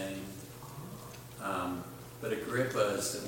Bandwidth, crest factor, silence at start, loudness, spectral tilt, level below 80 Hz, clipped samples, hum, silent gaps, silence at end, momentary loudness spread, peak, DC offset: 17 kHz; 20 dB; 0 s; -36 LUFS; -4 dB/octave; -64 dBFS; under 0.1%; none; none; 0 s; 15 LU; -16 dBFS; under 0.1%